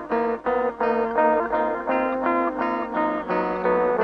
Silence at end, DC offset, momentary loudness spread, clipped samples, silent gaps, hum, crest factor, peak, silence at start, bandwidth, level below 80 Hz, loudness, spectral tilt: 0 s; under 0.1%; 4 LU; under 0.1%; none; none; 16 dB; -6 dBFS; 0 s; 6 kHz; -54 dBFS; -23 LUFS; -8 dB/octave